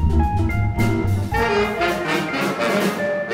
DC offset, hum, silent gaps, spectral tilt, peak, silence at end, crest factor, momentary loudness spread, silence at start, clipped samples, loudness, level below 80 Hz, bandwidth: under 0.1%; none; none; -6 dB/octave; -6 dBFS; 0 s; 12 dB; 2 LU; 0 s; under 0.1%; -20 LUFS; -28 dBFS; 16 kHz